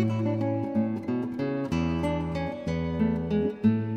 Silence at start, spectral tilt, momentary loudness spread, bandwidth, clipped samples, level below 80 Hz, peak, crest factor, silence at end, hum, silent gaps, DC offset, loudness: 0 s; -8.5 dB/octave; 5 LU; 8.6 kHz; under 0.1%; -46 dBFS; -12 dBFS; 16 dB; 0 s; none; none; under 0.1%; -28 LUFS